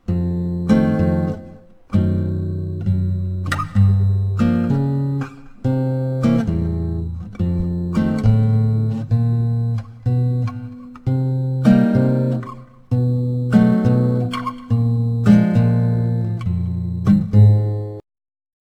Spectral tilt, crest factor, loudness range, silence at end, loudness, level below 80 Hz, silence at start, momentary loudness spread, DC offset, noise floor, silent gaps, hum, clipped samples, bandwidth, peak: -9.5 dB/octave; 16 dB; 4 LU; 0.75 s; -18 LUFS; -38 dBFS; 0.1 s; 11 LU; under 0.1%; -41 dBFS; none; none; under 0.1%; 8.6 kHz; -2 dBFS